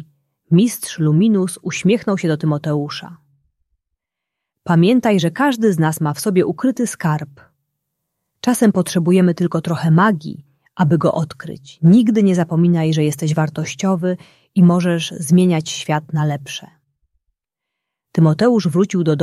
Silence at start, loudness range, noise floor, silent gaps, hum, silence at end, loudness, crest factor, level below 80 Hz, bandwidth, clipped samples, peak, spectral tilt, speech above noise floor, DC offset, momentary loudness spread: 0 s; 4 LU; -81 dBFS; none; none; 0 s; -16 LUFS; 16 dB; -60 dBFS; 13.5 kHz; under 0.1%; -2 dBFS; -6.5 dB/octave; 66 dB; under 0.1%; 11 LU